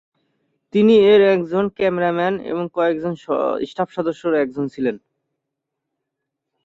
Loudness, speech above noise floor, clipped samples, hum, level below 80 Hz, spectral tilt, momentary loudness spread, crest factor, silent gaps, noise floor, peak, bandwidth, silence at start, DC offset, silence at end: -18 LUFS; 63 dB; under 0.1%; none; -60 dBFS; -7.5 dB/octave; 12 LU; 16 dB; none; -80 dBFS; -4 dBFS; 7.6 kHz; 0.75 s; under 0.1%; 1.7 s